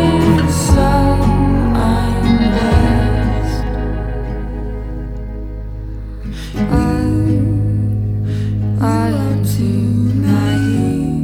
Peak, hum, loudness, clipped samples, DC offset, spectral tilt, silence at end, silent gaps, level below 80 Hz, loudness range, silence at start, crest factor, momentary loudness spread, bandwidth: 0 dBFS; none; -15 LUFS; under 0.1%; under 0.1%; -7 dB/octave; 0 s; none; -22 dBFS; 8 LU; 0 s; 14 dB; 14 LU; 16 kHz